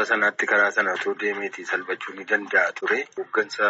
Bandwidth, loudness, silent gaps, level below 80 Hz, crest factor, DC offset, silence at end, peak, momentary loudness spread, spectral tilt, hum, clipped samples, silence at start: 8 kHz; -23 LUFS; none; -80 dBFS; 18 dB; under 0.1%; 0 s; -6 dBFS; 8 LU; -0.5 dB/octave; none; under 0.1%; 0 s